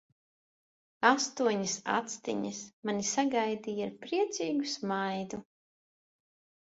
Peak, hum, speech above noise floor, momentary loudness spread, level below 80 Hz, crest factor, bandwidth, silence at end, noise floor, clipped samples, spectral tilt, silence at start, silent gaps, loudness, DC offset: -8 dBFS; none; over 58 dB; 10 LU; -76 dBFS; 24 dB; 8 kHz; 1.25 s; under -90 dBFS; under 0.1%; -3 dB/octave; 1 s; 2.73-2.83 s; -32 LUFS; under 0.1%